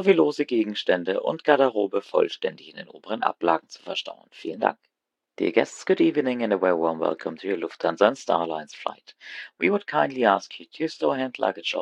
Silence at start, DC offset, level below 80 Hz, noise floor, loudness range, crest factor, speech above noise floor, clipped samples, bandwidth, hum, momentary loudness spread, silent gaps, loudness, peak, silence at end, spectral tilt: 0 s; under 0.1%; -76 dBFS; -84 dBFS; 4 LU; 24 dB; 59 dB; under 0.1%; 9.6 kHz; none; 13 LU; none; -24 LUFS; -2 dBFS; 0 s; -5 dB/octave